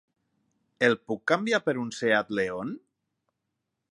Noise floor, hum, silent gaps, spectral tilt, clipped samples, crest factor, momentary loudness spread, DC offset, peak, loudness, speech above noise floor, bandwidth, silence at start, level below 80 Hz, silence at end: -82 dBFS; none; none; -4.5 dB/octave; under 0.1%; 22 dB; 10 LU; under 0.1%; -8 dBFS; -27 LUFS; 56 dB; 11.5 kHz; 0.8 s; -70 dBFS; 1.1 s